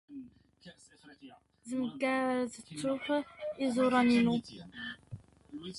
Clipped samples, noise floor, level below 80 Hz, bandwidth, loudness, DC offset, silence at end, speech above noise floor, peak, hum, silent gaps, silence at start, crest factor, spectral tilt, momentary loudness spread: under 0.1%; -51 dBFS; -68 dBFS; 11.5 kHz; -32 LUFS; under 0.1%; 0 s; 18 dB; -16 dBFS; none; none; 0.1 s; 18 dB; -5.5 dB/octave; 23 LU